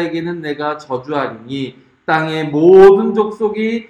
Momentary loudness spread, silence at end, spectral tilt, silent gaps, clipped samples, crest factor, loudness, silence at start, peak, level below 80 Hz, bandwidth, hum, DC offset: 18 LU; 0.05 s; -7.5 dB/octave; none; 0.3%; 14 dB; -13 LUFS; 0 s; 0 dBFS; -48 dBFS; 7.2 kHz; none; under 0.1%